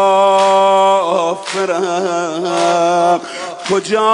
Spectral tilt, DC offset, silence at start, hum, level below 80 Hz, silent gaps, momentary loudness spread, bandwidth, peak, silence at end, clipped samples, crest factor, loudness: -3.5 dB/octave; under 0.1%; 0 s; none; -66 dBFS; none; 8 LU; 11 kHz; -2 dBFS; 0 s; under 0.1%; 12 dB; -14 LUFS